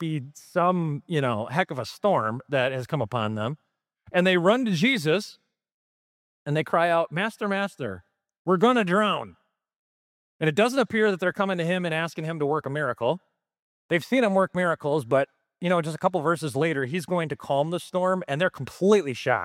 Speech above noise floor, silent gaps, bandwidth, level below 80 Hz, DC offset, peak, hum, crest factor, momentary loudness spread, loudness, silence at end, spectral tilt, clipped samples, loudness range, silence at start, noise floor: over 66 dB; 5.72-6.46 s, 8.39-8.45 s, 9.76-10.39 s, 13.59-13.89 s; 16 kHz; -70 dBFS; under 0.1%; -6 dBFS; none; 20 dB; 9 LU; -25 LUFS; 0 s; -6 dB/octave; under 0.1%; 2 LU; 0 s; under -90 dBFS